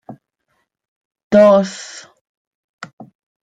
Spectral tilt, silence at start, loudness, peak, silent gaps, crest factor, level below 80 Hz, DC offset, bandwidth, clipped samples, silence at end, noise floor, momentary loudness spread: -6 dB/octave; 0.1 s; -13 LUFS; -2 dBFS; 0.88-1.11 s, 1.24-1.31 s, 2.21-2.78 s; 18 dB; -62 dBFS; under 0.1%; 9.2 kHz; under 0.1%; 0.55 s; -69 dBFS; 27 LU